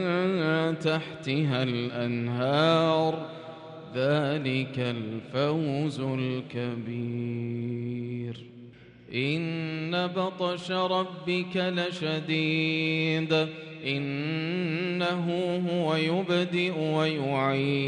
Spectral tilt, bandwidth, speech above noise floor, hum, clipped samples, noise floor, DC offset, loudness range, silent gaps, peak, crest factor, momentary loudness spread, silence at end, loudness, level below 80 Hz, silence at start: -7 dB/octave; 10 kHz; 21 dB; none; under 0.1%; -49 dBFS; under 0.1%; 5 LU; none; -12 dBFS; 16 dB; 8 LU; 0 s; -28 LUFS; -70 dBFS; 0 s